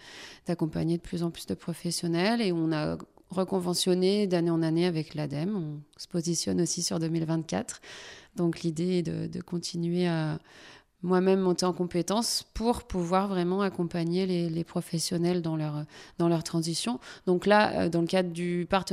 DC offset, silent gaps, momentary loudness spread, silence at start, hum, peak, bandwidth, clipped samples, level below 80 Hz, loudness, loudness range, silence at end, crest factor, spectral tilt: under 0.1%; none; 10 LU; 0.05 s; none; -8 dBFS; 15 kHz; under 0.1%; -56 dBFS; -29 LUFS; 3 LU; 0 s; 20 dB; -5.5 dB/octave